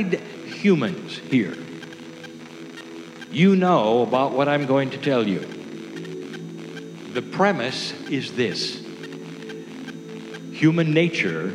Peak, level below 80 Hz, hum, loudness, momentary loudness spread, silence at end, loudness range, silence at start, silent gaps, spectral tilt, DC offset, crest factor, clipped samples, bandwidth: -4 dBFS; -80 dBFS; none; -22 LUFS; 19 LU; 0 s; 5 LU; 0 s; none; -6 dB/octave; under 0.1%; 18 dB; under 0.1%; 11.5 kHz